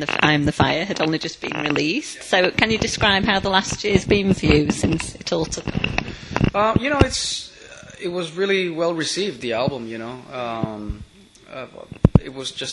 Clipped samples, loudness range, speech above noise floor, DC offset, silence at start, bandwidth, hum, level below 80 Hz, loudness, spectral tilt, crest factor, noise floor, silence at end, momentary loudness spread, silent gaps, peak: under 0.1%; 6 LU; 21 dB; under 0.1%; 0 s; 11.5 kHz; none; -36 dBFS; -20 LUFS; -4.5 dB/octave; 22 dB; -42 dBFS; 0 s; 15 LU; none; 0 dBFS